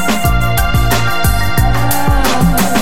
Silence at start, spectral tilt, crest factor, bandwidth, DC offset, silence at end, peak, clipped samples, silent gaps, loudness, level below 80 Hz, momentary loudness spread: 0 s; -4.5 dB/octave; 12 dB; 17 kHz; 20%; 0 s; 0 dBFS; under 0.1%; none; -13 LUFS; -18 dBFS; 2 LU